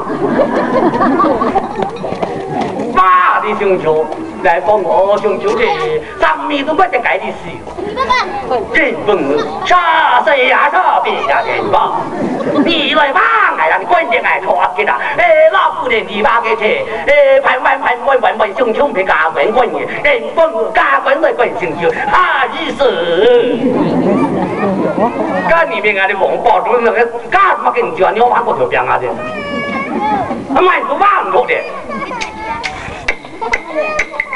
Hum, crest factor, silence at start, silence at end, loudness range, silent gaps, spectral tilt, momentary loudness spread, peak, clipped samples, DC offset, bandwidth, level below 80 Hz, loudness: none; 12 dB; 0 s; 0 s; 3 LU; none; -5 dB/octave; 9 LU; 0 dBFS; under 0.1%; under 0.1%; 11.5 kHz; -42 dBFS; -12 LUFS